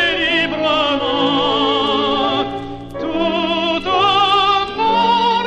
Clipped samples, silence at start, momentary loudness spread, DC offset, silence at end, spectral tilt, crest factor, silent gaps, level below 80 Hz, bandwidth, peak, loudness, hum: under 0.1%; 0 s; 8 LU; under 0.1%; 0 s; -4.5 dB/octave; 12 dB; none; -44 dBFS; 9.2 kHz; -4 dBFS; -15 LUFS; none